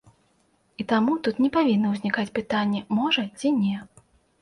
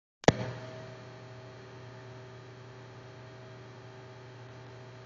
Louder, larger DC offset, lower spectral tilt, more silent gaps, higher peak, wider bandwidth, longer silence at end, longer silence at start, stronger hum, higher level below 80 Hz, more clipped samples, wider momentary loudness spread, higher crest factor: first, -24 LUFS vs -38 LUFS; neither; about the same, -6 dB/octave vs -5 dB/octave; neither; second, -10 dBFS vs -2 dBFS; first, 11.5 kHz vs 7.6 kHz; first, 0.55 s vs 0 s; first, 0.8 s vs 0.25 s; neither; about the same, -62 dBFS vs -62 dBFS; neither; second, 5 LU vs 18 LU; second, 16 dB vs 36 dB